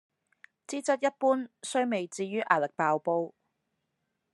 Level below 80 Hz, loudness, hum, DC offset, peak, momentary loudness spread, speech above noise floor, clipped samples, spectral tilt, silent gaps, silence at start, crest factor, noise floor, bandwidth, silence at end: -90 dBFS; -29 LUFS; none; under 0.1%; -8 dBFS; 7 LU; 52 dB; under 0.1%; -4.5 dB/octave; none; 0.7 s; 24 dB; -81 dBFS; 11.5 kHz; 1.05 s